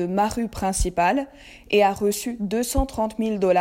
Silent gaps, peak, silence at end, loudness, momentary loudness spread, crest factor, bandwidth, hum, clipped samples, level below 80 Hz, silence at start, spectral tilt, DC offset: none; -6 dBFS; 0 s; -23 LUFS; 6 LU; 16 dB; 16.5 kHz; none; under 0.1%; -34 dBFS; 0 s; -4.5 dB/octave; under 0.1%